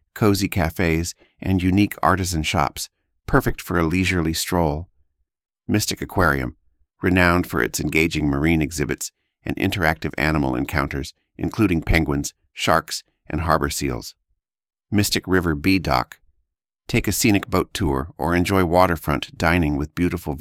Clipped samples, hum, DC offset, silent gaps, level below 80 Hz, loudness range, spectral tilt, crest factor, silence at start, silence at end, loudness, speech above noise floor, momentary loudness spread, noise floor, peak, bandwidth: under 0.1%; none; under 0.1%; none; -36 dBFS; 3 LU; -5 dB/octave; 20 dB; 0.15 s; 0 s; -21 LUFS; 52 dB; 12 LU; -73 dBFS; -2 dBFS; 17.5 kHz